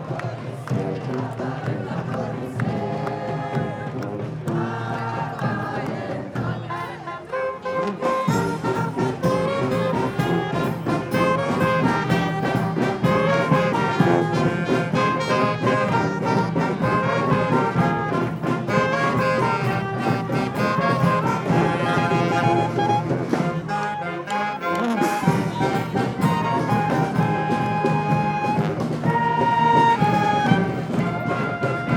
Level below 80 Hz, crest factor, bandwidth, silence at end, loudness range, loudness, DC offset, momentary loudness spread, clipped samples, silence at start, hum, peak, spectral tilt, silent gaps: -52 dBFS; 18 dB; 17 kHz; 0 s; 7 LU; -22 LUFS; under 0.1%; 8 LU; under 0.1%; 0 s; none; -4 dBFS; -7 dB/octave; none